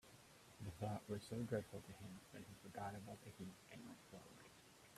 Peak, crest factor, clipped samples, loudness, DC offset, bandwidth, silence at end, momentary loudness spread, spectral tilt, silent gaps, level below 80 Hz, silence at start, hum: -30 dBFS; 22 dB; under 0.1%; -52 LUFS; under 0.1%; 15 kHz; 0 s; 17 LU; -6 dB/octave; none; -76 dBFS; 0.05 s; none